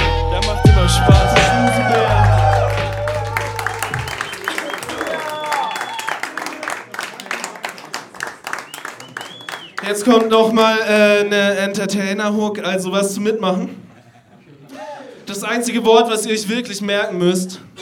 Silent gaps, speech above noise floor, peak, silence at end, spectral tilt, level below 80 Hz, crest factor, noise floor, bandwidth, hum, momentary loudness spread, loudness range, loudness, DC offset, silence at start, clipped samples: none; 31 dB; 0 dBFS; 0 s; -5 dB/octave; -28 dBFS; 18 dB; -46 dBFS; 17.5 kHz; none; 17 LU; 10 LU; -17 LUFS; under 0.1%; 0 s; under 0.1%